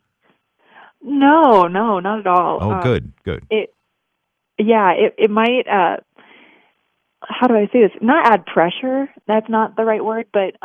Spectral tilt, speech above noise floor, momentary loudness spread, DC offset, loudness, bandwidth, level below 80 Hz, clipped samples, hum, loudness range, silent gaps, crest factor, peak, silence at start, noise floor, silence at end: -8 dB/octave; 59 dB; 10 LU; under 0.1%; -16 LUFS; 6.6 kHz; -50 dBFS; under 0.1%; none; 2 LU; none; 16 dB; 0 dBFS; 1.05 s; -74 dBFS; 0.15 s